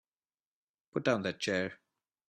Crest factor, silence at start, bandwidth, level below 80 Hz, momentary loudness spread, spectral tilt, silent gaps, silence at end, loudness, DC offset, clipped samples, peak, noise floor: 22 dB; 0.95 s; 13 kHz; -76 dBFS; 9 LU; -5 dB/octave; none; 0.55 s; -34 LUFS; under 0.1%; under 0.1%; -14 dBFS; under -90 dBFS